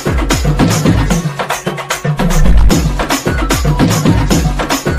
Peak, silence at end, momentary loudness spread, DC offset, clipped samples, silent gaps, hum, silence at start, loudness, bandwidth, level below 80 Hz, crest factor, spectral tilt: 0 dBFS; 0 s; 6 LU; under 0.1%; 0.7%; none; none; 0 s; -13 LUFS; 16 kHz; -16 dBFS; 10 dB; -5 dB/octave